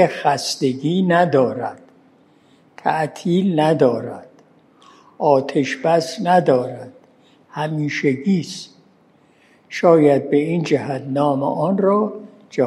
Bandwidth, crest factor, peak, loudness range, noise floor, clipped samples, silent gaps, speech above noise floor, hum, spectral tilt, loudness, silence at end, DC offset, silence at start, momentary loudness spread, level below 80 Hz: 12.5 kHz; 18 dB; 0 dBFS; 4 LU; -54 dBFS; under 0.1%; none; 37 dB; none; -6 dB/octave; -18 LUFS; 0 s; under 0.1%; 0 s; 14 LU; -70 dBFS